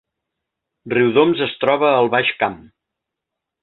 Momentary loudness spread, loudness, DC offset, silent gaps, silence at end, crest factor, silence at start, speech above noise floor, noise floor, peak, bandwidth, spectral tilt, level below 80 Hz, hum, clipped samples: 8 LU; -17 LUFS; under 0.1%; none; 1.05 s; 20 dB; 0.85 s; 66 dB; -82 dBFS; 0 dBFS; 4.3 kHz; -8.5 dB/octave; -60 dBFS; none; under 0.1%